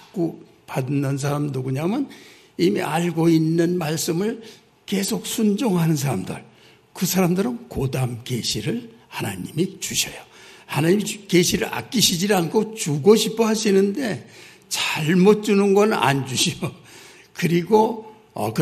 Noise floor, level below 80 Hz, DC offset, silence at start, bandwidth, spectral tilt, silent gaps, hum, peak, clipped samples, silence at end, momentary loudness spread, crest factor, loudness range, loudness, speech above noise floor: -46 dBFS; -56 dBFS; under 0.1%; 0.15 s; 14 kHz; -5 dB/octave; none; none; -2 dBFS; under 0.1%; 0 s; 12 LU; 20 dB; 5 LU; -21 LUFS; 25 dB